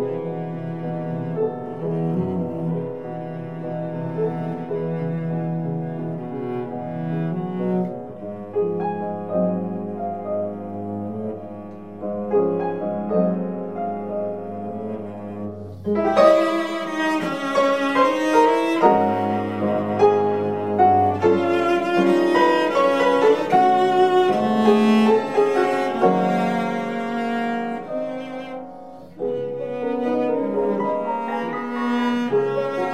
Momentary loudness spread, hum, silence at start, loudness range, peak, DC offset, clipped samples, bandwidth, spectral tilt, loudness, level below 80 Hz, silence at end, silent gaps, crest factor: 13 LU; none; 0 s; 9 LU; -4 dBFS; 0.4%; under 0.1%; 14.5 kHz; -7 dB/octave; -21 LUFS; -66 dBFS; 0 s; none; 18 dB